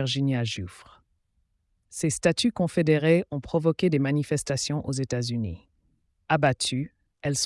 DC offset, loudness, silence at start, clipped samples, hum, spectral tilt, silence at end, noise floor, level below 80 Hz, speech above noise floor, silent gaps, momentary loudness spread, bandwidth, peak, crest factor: under 0.1%; -26 LUFS; 0 s; under 0.1%; none; -5 dB/octave; 0 s; -72 dBFS; -56 dBFS; 47 dB; none; 12 LU; 12 kHz; -8 dBFS; 18 dB